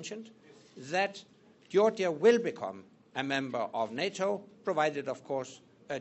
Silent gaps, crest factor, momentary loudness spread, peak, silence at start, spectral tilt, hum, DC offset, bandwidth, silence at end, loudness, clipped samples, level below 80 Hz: none; 22 dB; 17 LU; -12 dBFS; 0 s; -4.5 dB/octave; none; under 0.1%; 8.2 kHz; 0 s; -31 LUFS; under 0.1%; -80 dBFS